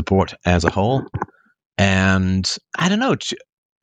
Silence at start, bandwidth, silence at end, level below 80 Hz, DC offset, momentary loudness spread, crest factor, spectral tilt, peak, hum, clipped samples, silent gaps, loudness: 0 s; 9.4 kHz; 0.45 s; -40 dBFS; under 0.1%; 13 LU; 18 dB; -5 dB/octave; -2 dBFS; none; under 0.1%; 1.66-1.71 s; -19 LUFS